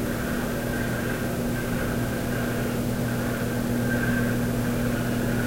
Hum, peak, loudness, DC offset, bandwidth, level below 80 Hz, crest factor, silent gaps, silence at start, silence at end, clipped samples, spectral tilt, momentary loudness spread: none; -14 dBFS; -26 LUFS; under 0.1%; 16 kHz; -38 dBFS; 12 dB; none; 0 s; 0 s; under 0.1%; -6 dB/octave; 3 LU